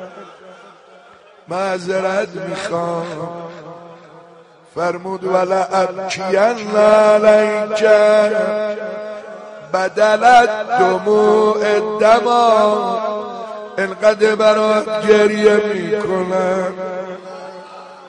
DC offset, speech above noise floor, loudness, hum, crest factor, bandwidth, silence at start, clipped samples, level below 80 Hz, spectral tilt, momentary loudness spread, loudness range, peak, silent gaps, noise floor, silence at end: under 0.1%; 30 dB; -15 LUFS; none; 16 dB; 10 kHz; 0 s; under 0.1%; -58 dBFS; -4.5 dB/octave; 19 LU; 10 LU; 0 dBFS; none; -44 dBFS; 0 s